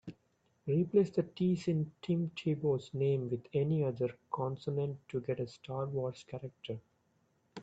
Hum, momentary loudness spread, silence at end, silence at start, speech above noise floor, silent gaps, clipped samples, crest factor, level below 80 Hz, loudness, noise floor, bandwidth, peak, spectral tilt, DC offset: none; 14 LU; 0 s; 0.05 s; 41 dB; none; under 0.1%; 18 dB; -72 dBFS; -35 LUFS; -75 dBFS; 8 kHz; -18 dBFS; -8.5 dB/octave; under 0.1%